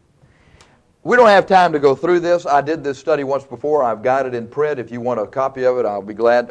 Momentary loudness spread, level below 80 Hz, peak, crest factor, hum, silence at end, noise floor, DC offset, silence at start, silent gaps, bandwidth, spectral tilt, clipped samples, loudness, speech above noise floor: 11 LU; -56 dBFS; -2 dBFS; 16 dB; none; 0 s; -52 dBFS; under 0.1%; 1.05 s; none; 9.8 kHz; -5.5 dB/octave; under 0.1%; -16 LUFS; 36 dB